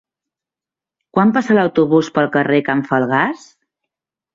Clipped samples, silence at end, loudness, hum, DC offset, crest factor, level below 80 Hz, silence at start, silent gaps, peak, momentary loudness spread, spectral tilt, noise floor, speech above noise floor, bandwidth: under 0.1%; 1 s; -15 LUFS; none; under 0.1%; 16 dB; -60 dBFS; 1.15 s; none; -2 dBFS; 6 LU; -7 dB/octave; -88 dBFS; 74 dB; 7.8 kHz